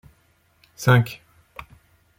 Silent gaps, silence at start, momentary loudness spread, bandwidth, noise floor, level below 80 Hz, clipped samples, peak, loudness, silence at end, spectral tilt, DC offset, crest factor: none; 0.8 s; 24 LU; 16.5 kHz; -62 dBFS; -56 dBFS; under 0.1%; -4 dBFS; -20 LUFS; 1.05 s; -6 dB/octave; under 0.1%; 22 dB